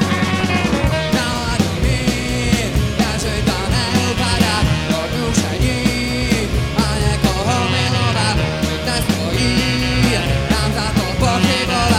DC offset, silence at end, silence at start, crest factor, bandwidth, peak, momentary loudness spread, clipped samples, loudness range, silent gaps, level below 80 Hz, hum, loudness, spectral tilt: under 0.1%; 0 s; 0 s; 16 dB; 16.5 kHz; 0 dBFS; 3 LU; under 0.1%; 1 LU; none; -26 dBFS; none; -17 LUFS; -4.5 dB/octave